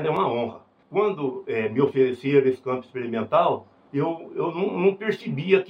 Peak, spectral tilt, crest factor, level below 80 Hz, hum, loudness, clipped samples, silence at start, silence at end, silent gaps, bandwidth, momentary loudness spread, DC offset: -6 dBFS; -8.5 dB/octave; 18 dB; -72 dBFS; none; -24 LUFS; under 0.1%; 0 s; 0 s; none; 6.2 kHz; 9 LU; under 0.1%